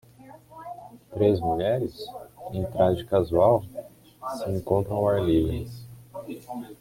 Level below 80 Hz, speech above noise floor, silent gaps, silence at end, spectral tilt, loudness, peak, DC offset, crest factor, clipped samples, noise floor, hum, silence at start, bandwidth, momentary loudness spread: -48 dBFS; 25 dB; none; 0.05 s; -8 dB/octave; -25 LUFS; -6 dBFS; under 0.1%; 20 dB; under 0.1%; -49 dBFS; none; 0.2 s; 16.5 kHz; 20 LU